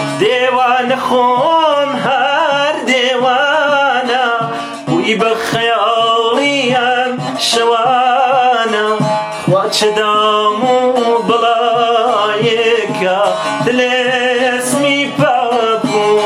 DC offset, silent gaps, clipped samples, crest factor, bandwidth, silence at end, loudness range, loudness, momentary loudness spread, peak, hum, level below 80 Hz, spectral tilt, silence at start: under 0.1%; none; under 0.1%; 10 dB; 15.5 kHz; 0 s; 1 LU; -12 LUFS; 3 LU; -2 dBFS; none; -60 dBFS; -3.5 dB/octave; 0 s